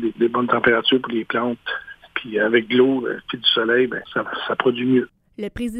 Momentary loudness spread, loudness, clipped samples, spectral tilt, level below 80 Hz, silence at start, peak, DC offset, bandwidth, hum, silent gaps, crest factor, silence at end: 13 LU; -20 LUFS; under 0.1%; -6 dB/octave; -52 dBFS; 0 s; -2 dBFS; under 0.1%; 10 kHz; none; none; 18 dB; 0 s